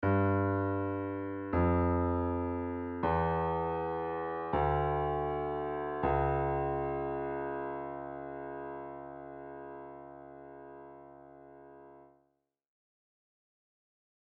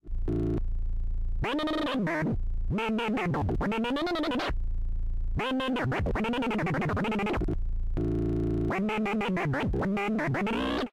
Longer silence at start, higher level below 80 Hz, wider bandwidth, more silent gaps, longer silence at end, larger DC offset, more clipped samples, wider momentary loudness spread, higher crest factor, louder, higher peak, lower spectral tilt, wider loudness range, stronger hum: about the same, 0 s vs 0.05 s; second, -50 dBFS vs -34 dBFS; second, 4.4 kHz vs 10.5 kHz; neither; first, 2.2 s vs 0 s; neither; neither; first, 20 LU vs 6 LU; first, 18 dB vs 8 dB; second, -33 LUFS vs -30 LUFS; first, -18 dBFS vs -22 dBFS; about the same, -7.5 dB/octave vs -7 dB/octave; first, 18 LU vs 1 LU; neither